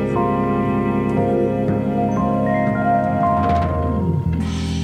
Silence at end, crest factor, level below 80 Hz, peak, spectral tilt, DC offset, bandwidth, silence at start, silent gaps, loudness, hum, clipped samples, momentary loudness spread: 0 s; 12 dB; -34 dBFS; -6 dBFS; -8.5 dB/octave; under 0.1%; 10 kHz; 0 s; none; -19 LUFS; none; under 0.1%; 3 LU